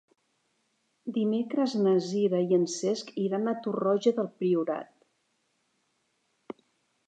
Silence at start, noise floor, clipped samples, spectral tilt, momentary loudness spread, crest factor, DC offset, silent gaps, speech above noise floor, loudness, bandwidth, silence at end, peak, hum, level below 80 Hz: 1.05 s; -75 dBFS; under 0.1%; -6 dB/octave; 15 LU; 18 dB; under 0.1%; none; 48 dB; -28 LUFS; 9.2 kHz; 0.55 s; -12 dBFS; none; -86 dBFS